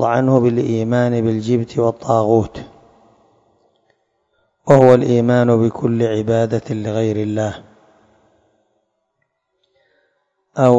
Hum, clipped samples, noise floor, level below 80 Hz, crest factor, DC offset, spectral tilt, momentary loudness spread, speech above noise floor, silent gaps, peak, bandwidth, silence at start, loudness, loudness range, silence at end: none; 0.2%; -71 dBFS; -52 dBFS; 18 dB; under 0.1%; -8 dB/octave; 11 LU; 56 dB; none; 0 dBFS; 7.8 kHz; 0 s; -16 LUFS; 10 LU; 0 s